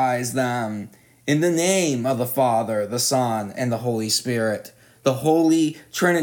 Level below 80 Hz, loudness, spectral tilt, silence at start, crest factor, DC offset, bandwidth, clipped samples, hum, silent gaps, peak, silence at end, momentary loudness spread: -70 dBFS; -22 LUFS; -4.5 dB/octave; 0 s; 16 dB; under 0.1%; 19.5 kHz; under 0.1%; none; none; -6 dBFS; 0 s; 7 LU